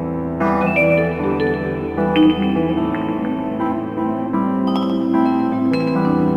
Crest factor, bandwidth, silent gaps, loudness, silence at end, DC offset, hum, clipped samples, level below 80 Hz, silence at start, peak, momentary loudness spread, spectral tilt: 14 dB; 5.8 kHz; none; -18 LUFS; 0 s; under 0.1%; none; under 0.1%; -44 dBFS; 0 s; -4 dBFS; 7 LU; -8.5 dB/octave